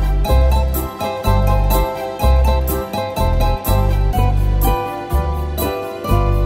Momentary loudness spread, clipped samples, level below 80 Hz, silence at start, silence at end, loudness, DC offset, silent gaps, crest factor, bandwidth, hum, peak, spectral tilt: 6 LU; under 0.1%; -18 dBFS; 0 s; 0 s; -18 LUFS; under 0.1%; none; 14 dB; 16.5 kHz; none; -2 dBFS; -6.5 dB/octave